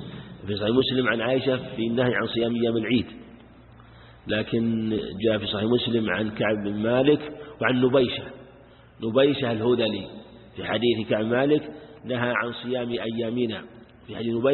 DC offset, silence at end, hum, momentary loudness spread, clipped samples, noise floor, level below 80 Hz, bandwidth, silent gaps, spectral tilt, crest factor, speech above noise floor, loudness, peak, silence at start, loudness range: under 0.1%; 0 s; none; 15 LU; under 0.1%; -50 dBFS; -54 dBFS; 4.3 kHz; none; -10.5 dB/octave; 18 dB; 26 dB; -25 LUFS; -6 dBFS; 0 s; 3 LU